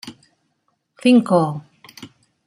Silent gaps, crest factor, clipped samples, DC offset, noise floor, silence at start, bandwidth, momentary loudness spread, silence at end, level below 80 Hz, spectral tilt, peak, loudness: none; 18 dB; under 0.1%; under 0.1%; -70 dBFS; 0.05 s; 11.5 kHz; 26 LU; 0.4 s; -66 dBFS; -6.5 dB/octave; -2 dBFS; -17 LUFS